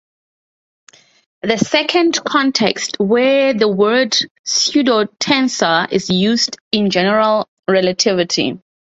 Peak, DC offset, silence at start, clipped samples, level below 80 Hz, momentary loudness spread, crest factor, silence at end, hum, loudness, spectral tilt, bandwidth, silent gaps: 0 dBFS; under 0.1%; 1.45 s; under 0.1%; -58 dBFS; 5 LU; 16 dB; 0.35 s; none; -15 LUFS; -3.5 dB/octave; 8.2 kHz; 4.31-4.44 s, 6.61-6.71 s, 7.48-7.63 s